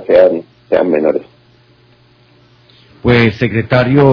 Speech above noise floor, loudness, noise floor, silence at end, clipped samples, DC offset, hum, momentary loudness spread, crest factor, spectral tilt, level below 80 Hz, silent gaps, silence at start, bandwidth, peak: 38 dB; -12 LUFS; -48 dBFS; 0 s; 0.6%; under 0.1%; none; 9 LU; 14 dB; -9 dB/octave; -40 dBFS; none; 0 s; 5.4 kHz; 0 dBFS